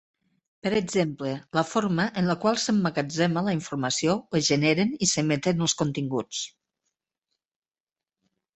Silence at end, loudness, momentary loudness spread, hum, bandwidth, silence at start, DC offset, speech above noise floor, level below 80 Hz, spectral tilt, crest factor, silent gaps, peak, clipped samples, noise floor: 2.05 s; -25 LUFS; 6 LU; none; 8.4 kHz; 0.65 s; under 0.1%; over 65 dB; -62 dBFS; -4.5 dB/octave; 20 dB; none; -8 dBFS; under 0.1%; under -90 dBFS